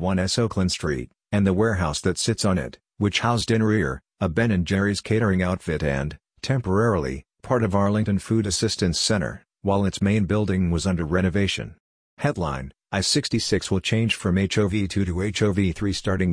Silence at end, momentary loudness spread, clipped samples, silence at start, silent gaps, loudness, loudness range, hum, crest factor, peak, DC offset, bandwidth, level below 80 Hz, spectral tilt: 0 s; 7 LU; under 0.1%; 0 s; 11.80-12.17 s; -23 LUFS; 1 LU; none; 16 dB; -6 dBFS; under 0.1%; 10.5 kHz; -42 dBFS; -5 dB/octave